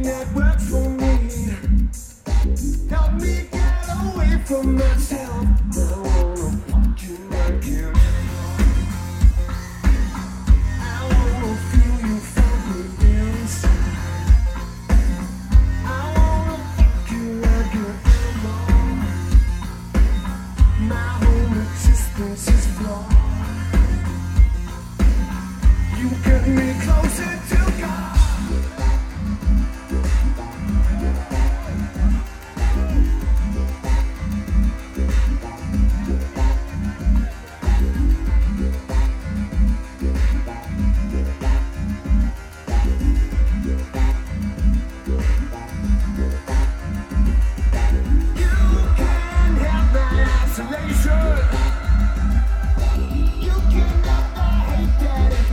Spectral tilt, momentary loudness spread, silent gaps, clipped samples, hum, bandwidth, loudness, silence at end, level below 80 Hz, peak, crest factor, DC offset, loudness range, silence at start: -6.5 dB/octave; 7 LU; none; under 0.1%; none; 14 kHz; -21 LUFS; 0 s; -18 dBFS; -2 dBFS; 16 dB; under 0.1%; 3 LU; 0 s